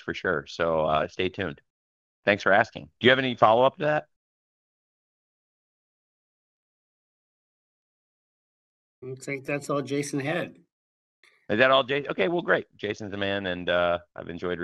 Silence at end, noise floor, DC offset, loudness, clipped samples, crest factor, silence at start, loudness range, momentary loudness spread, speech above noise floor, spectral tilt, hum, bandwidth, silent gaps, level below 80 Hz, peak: 0 s; under -90 dBFS; under 0.1%; -25 LUFS; under 0.1%; 24 dB; 0.05 s; 11 LU; 13 LU; over 65 dB; -5 dB/octave; none; 12 kHz; 1.70-2.23 s, 4.16-9.02 s, 10.72-11.23 s; -62 dBFS; -4 dBFS